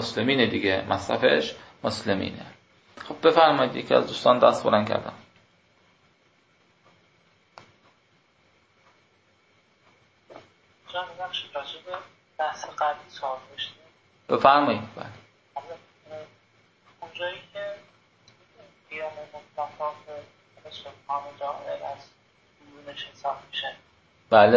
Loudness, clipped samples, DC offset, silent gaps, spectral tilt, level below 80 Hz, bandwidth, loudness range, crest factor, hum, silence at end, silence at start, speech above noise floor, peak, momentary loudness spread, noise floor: -25 LUFS; under 0.1%; under 0.1%; none; -5 dB/octave; -62 dBFS; 8 kHz; 17 LU; 24 dB; none; 0 s; 0 s; 38 dB; -2 dBFS; 24 LU; -64 dBFS